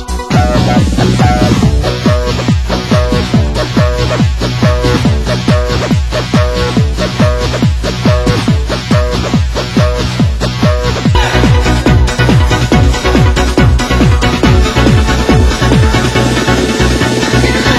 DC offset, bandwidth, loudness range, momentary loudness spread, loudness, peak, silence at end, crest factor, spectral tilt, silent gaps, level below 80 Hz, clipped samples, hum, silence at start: 0.5%; 16 kHz; 3 LU; 4 LU; -10 LUFS; 0 dBFS; 0 s; 10 dB; -5.5 dB/octave; none; -16 dBFS; 0.7%; none; 0 s